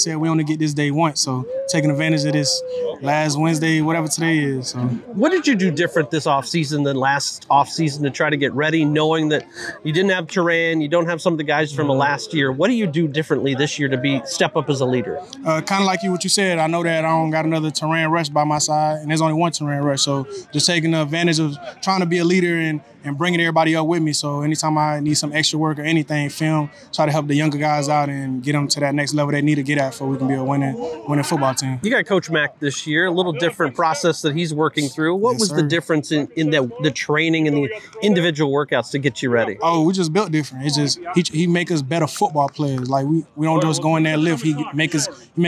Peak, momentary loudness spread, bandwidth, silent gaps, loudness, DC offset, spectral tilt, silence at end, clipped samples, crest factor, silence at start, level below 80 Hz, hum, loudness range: -2 dBFS; 5 LU; 15 kHz; none; -19 LUFS; under 0.1%; -4.5 dB/octave; 0 s; under 0.1%; 16 dB; 0 s; -62 dBFS; none; 1 LU